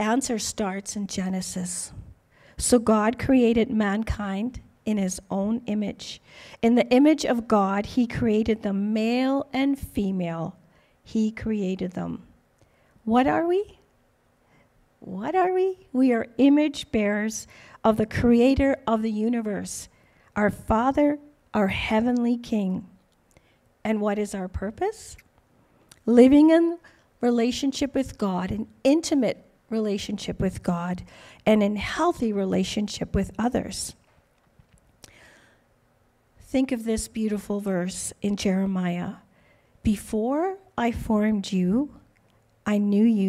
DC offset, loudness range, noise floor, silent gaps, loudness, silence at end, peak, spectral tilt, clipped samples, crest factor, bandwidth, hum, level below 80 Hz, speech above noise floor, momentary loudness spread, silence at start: under 0.1%; 8 LU; -64 dBFS; none; -24 LUFS; 0 s; -4 dBFS; -5.5 dB/octave; under 0.1%; 20 dB; 14.5 kHz; none; -46 dBFS; 40 dB; 13 LU; 0 s